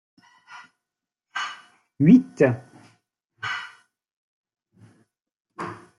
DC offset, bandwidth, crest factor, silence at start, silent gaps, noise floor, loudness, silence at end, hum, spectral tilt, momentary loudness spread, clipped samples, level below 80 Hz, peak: under 0.1%; 7.6 kHz; 22 dB; 0.5 s; 4.13-4.44 s, 5.40-5.45 s; -87 dBFS; -22 LUFS; 0.25 s; none; -7.5 dB/octave; 27 LU; under 0.1%; -68 dBFS; -4 dBFS